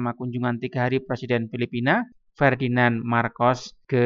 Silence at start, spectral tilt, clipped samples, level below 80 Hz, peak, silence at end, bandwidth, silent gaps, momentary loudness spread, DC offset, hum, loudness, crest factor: 0 s; -7 dB/octave; under 0.1%; -60 dBFS; -4 dBFS; 0 s; 7.4 kHz; none; 7 LU; under 0.1%; none; -24 LUFS; 18 dB